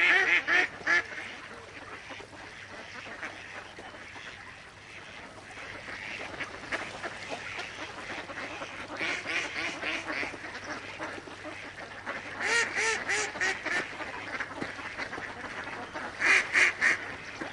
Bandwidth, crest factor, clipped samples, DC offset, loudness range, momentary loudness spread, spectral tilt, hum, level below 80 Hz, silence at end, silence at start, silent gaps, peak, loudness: 11.5 kHz; 24 dB; under 0.1%; under 0.1%; 14 LU; 20 LU; -1.5 dB/octave; none; -64 dBFS; 0 s; 0 s; none; -8 dBFS; -30 LUFS